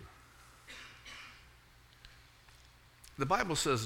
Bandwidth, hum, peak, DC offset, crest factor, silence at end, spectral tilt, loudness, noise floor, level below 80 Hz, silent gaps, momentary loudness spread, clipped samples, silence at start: 18.5 kHz; none; -14 dBFS; under 0.1%; 24 dB; 0 s; -3.5 dB/octave; -36 LUFS; -61 dBFS; -60 dBFS; none; 28 LU; under 0.1%; 0 s